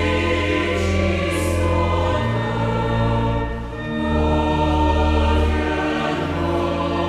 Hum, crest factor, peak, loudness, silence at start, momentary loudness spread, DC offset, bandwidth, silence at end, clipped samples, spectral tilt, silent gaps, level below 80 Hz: none; 12 dB; -6 dBFS; -20 LUFS; 0 s; 4 LU; under 0.1%; 13 kHz; 0 s; under 0.1%; -6.5 dB/octave; none; -26 dBFS